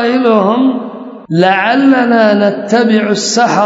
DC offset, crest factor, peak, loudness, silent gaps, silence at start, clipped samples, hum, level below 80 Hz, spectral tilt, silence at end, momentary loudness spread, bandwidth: under 0.1%; 10 dB; 0 dBFS; -10 LUFS; none; 0 s; under 0.1%; none; -62 dBFS; -4.5 dB/octave; 0 s; 8 LU; 8 kHz